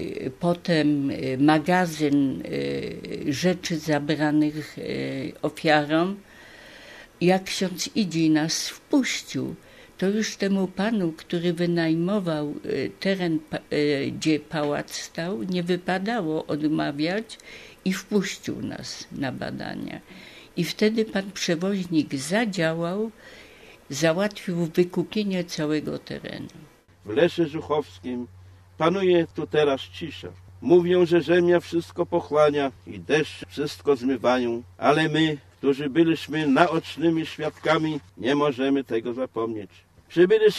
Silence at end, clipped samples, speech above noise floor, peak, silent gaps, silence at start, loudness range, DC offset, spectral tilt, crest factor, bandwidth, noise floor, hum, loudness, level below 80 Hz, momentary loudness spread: 0 s; under 0.1%; 25 dB; -2 dBFS; none; 0 s; 5 LU; under 0.1%; -5.5 dB/octave; 22 dB; 14 kHz; -49 dBFS; none; -25 LUFS; -60 dBFS; 13 LU